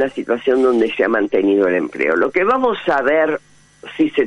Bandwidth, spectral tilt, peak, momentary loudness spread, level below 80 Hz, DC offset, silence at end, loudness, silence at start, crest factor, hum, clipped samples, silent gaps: 9.6 kHz; -6 dB/octave; -2 dBFS; 5 LU; -56 dBFS; under 0.1%; 0 s; -16 LUFS; 0 s; 14 dB; none; under 0.1%; none